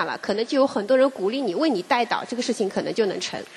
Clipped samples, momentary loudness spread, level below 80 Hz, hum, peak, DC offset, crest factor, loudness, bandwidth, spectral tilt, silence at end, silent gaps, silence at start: under 0.1%; 6 LU; -72 dBFS; none; -6 dBFS; under 0.1%; 16 dB; -23 LUFS; 12 kHz; -4 dB/octave; 0 s; none; 0 s